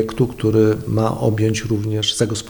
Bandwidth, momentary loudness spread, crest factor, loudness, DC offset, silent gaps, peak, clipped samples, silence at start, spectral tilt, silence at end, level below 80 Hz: 20 kHz; 4 LU; 14 dB; -18 LUFS; under 0.1%; none; -4 dBFS; under 0.1%; 0 s; -5.5 dB/octave; 0 s; -42 dBFS